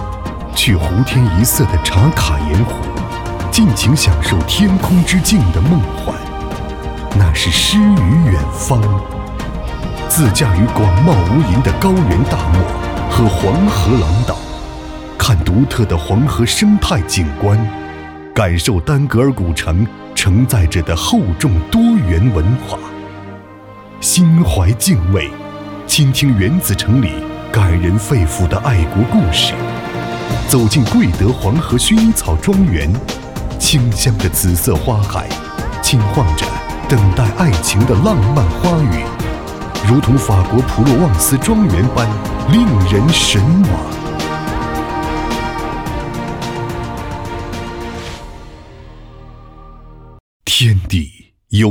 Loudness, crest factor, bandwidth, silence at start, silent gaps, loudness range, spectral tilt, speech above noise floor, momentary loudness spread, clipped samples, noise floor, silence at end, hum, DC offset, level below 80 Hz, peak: -14 LUFS; 14 dB; 19 kHz; 0 s; 50.20-50.40 s; 6 LU; -5 dB/octave; 24 dB; 12 LU; under 0.1%; -36 dBFS; 0 s; none; under 0.1%; -24 dBFS; 0 dBFS